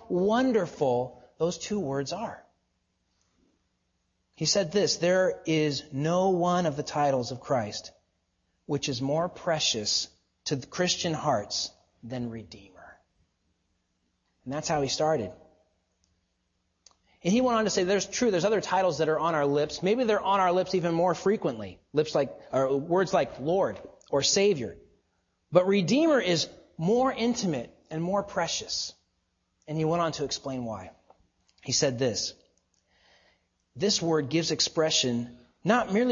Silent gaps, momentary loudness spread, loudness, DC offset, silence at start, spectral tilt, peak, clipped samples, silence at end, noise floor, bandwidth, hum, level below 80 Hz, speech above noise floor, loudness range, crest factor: none; 11 LU; -27 LUFS; under 0.1%; 0 s; -4 dB/octave; -6 dBFS; under 0.1%; 0 s; -76 dBFS; 7.6 kHz; none; -62 dBFS; 49 dB; 7 LU; 22 dB